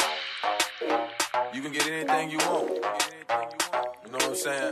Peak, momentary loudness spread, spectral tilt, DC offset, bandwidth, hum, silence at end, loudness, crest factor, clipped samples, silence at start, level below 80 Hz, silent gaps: -10 dBFS; 4 LU; -1.5 dB/octave; under 0.1%; 15 kHz; none; 0 s; -28 LUFS; 18 dB; under 0.1%; 0 s; -70 dBFS; none